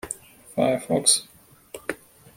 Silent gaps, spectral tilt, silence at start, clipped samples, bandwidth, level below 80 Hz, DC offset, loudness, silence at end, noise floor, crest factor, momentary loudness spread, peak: none; -2.5 dB/octave; 0.05 s; under 0.1%; 16.5 kHz; -60 dBFS; under 0.1%; -22 LUFS; 0.4 s; -45 dBFS; 24 dB; 19 LU; -2 dBFS